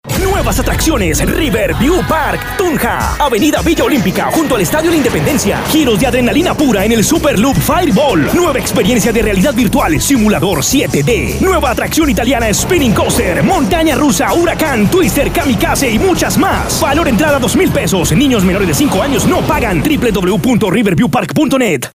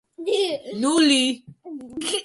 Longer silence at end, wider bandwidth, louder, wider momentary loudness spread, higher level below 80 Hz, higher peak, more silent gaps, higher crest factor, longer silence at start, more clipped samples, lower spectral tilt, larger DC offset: about the same, 0.05 s vs 0 s; first, 16 kHz vs 11.5 kHz; first, -11 LUFS vs -21 LUFS; second, 2 LU vs 19 LU; first, -24 dBFS vs -68 dBFS; first, -2 dBFS vs -6 dBFS; neither; second, 10 dB vs 18 dB; second, 0.05 s vs 0.2 s; neither; first, -4.5 dB/octave vs -2 dB/octave; neither